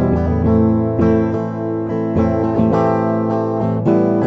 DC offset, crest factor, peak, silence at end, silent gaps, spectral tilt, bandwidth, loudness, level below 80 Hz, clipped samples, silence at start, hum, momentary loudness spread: under 0.1%; 14 dB; -2 dBFS; 0 s; none; -10.5 dB/octave; 6.2 kHz; -16 LUFS; -34 dBFS; under 0.1%; 0 s; none; 6 LU